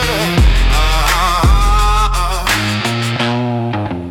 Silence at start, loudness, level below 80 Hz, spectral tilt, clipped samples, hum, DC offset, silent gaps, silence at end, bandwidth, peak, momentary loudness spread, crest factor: 0 s; -14 LUFS; -16 dBFS; -4.5 dB/octave; under 0.1%; none; under 0.1%; none; 0 s; 16.5 kHz; -2 dBFS; 5 LU; 12 dB